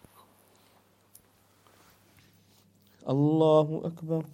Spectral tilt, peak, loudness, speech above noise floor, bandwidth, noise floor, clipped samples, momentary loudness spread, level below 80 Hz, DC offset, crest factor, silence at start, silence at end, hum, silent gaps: -9 dB/octave; -10 dBFS; -26 LUFS; 38 dB; 16 kHz; -63 dBFS; under 0.1%; 13 LU; -74 dBFS; under 0.1%; 22 dB; 3.05 s; 0.05 s; none; none